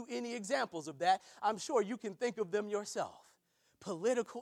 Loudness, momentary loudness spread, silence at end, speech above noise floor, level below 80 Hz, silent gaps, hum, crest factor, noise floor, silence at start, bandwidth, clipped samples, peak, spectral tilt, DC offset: -37 LUFS; 8 LU; 0 s; 38 dB; -86 dBFS; none; none; 20 dB; -75 dBFS; 0 s; 14.5 kHz; under 0.1%; -18 dBFS; -3.5 dB/octave; under 0.1%